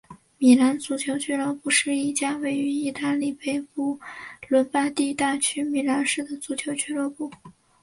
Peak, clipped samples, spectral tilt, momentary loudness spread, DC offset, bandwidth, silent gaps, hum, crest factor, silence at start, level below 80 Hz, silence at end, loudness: -6 dBFS; under 0.1%; -2.5 dB/octave; 10 LU; under 0.1%; 11.5 kHz; none; none; 20 dB; 0.1 s; -68 dBFS; 0.3 s; -24 LUFS